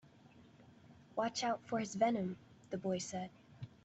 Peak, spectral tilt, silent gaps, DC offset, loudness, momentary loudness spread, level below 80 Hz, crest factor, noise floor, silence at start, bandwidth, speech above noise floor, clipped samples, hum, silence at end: -20 dBFS; -4.5 dB/octave; none; under 0.1%; -39 LUFS; 16 LU; -76 dBFS; 20 dB; -62 dBFS; 0.35 s; 8.2 kHz; 25 dB; under 0.1%; none; 0.15 s